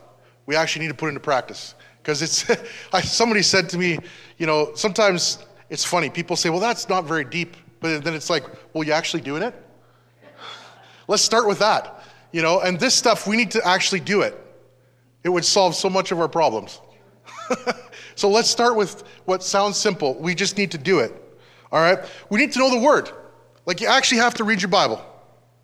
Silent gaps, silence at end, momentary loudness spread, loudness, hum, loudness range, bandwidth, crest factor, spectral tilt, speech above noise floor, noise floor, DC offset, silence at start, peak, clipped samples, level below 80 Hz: none; 0.55 s; 14 LU; -20 LUFS; none; 4 LU; 15 kHz; 18 dB; -3 dB/octave; 37 dB; -57 dBFS; under 0.1%; 0.5 s; -2 dBFS; under 0.1%; -62 dBFS